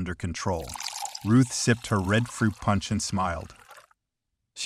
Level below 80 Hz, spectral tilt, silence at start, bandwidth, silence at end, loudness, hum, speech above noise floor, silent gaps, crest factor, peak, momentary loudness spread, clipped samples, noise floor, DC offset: -48 dBFS; -5 dB/octave; 0 s; 15 kHz; 0 s; -27 LUFS; none; 56 dB; none; 18 dB; -10 dBFS; 11 LU; under 0.1%; -82 dBFS; under 0.1%